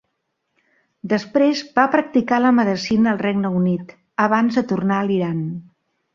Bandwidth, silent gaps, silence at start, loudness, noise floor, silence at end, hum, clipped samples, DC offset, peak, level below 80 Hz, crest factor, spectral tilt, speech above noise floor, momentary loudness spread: 7.4 kHz; none; 1.05 s; -19 LUFS; -74 dBFS; 0.55 s; none; under 0.1%; under 0.1%; -2 dBFS; -58 dBFS; 18 dB; -7 dB/octave; 56 dB; 10 LU